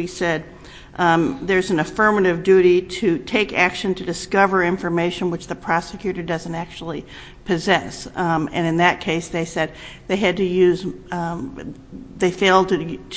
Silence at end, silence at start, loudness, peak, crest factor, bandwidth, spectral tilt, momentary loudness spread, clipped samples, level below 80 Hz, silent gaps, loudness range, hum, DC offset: 0 s; 0 s; -20 LUFS; 0 dBFS; 20 dB; 8 kHz; -5.5 dB/octave; 14 LU; under 0.1%; -46 dBFS; none; 6 LU; none; under 0.1%